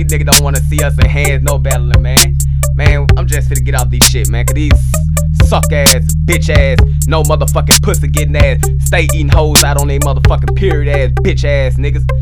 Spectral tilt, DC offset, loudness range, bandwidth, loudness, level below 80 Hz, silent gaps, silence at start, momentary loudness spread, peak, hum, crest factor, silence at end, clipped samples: -4 dB/octave; under 0.1%; 1 LU; over 20 kHz; -10 LUFS; -14 dBFS; none; 0 s; 6 LU; 0 dBFS; none; 10 dB; 0 s; 1%